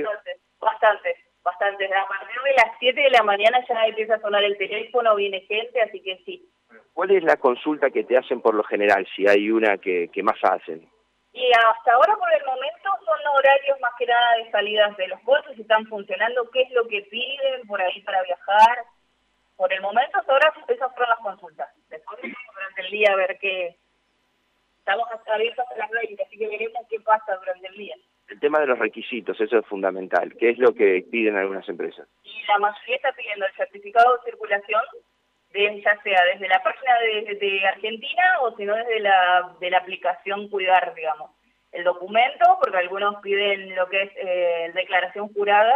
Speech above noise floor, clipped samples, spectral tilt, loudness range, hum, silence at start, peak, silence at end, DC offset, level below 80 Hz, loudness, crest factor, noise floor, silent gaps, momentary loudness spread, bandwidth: 47 dB; under 0.1%; -4 dB/octave; 5 LU; none; 0 s; -6 dBFS; 0 s; under 0.1%; -74 dBFS; -21 LUFS; 16 dB; -68 dBFS; none; 13 LU; 8.8 kHz